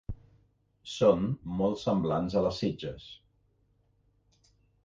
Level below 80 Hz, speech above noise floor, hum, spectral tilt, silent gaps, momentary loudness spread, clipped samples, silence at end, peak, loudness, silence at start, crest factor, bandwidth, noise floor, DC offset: -52 dBFS; 41 dB; 50 Hz at -60 dBFS; -7 dB/octave; none; 22 LU; under 0.1%; 1.7 s; -12 dBFS; -29 LUFS; 0.1 s; 20 dB; 7.6 kHz; -70 dBFS; under 0.1%